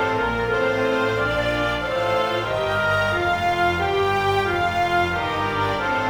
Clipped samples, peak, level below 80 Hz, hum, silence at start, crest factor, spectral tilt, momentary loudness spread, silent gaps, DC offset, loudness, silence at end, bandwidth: under 0.1%; -10 dBFS; -42 dBFS; none; 0 s; 12 dB; -5.5 dB/octave; 2 LU; none; under 0.1%; -21 LUFS; 0 s; over 20 kHz